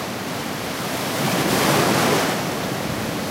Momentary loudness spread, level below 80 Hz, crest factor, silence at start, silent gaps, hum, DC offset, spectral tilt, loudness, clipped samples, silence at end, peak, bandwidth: 9 LU; -50 dBFS; 18 dB; 0 s; none; none; under 0.1%; -4 dB/octave; -21 LUFS; under 0.1%; 0 s; -4 dBFS; 16 kHz